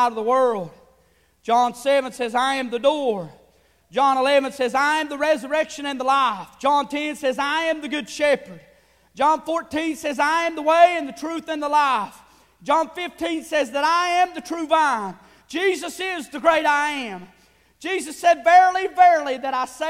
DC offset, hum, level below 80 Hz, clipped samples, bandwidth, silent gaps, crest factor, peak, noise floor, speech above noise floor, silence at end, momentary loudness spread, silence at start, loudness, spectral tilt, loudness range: under 0.1%; none; -62 dBFS; under 0.1%; 15.5 kHz; none; 18 dB; -2 dBFS; -60 dBFS; 40 dB; 0 s; 12 LU; 0 s; -21 LUFS; -3 dB/octave; 3 LU